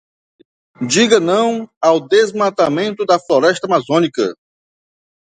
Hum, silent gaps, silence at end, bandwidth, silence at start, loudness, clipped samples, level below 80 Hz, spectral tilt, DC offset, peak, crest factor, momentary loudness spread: none; 1.77-1.81 s; 1 s; 9.6 kHz; 0.8 s; -15 LUFS; under 0.1%; -62 dBFS; -4 dB/octave; under 0.1%; 0 dBFS; 16 dB; 7 LU